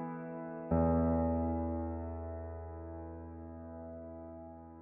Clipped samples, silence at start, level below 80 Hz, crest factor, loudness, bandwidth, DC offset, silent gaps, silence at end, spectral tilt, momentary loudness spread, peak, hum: under 0.1%; 0 s; -48 dBFS; 18 dB; -37 LUFS; 2.8 kHz; under 0.1%; none; 0 s; -7.5 dB/octave; 17 LU; -20 dBFS; none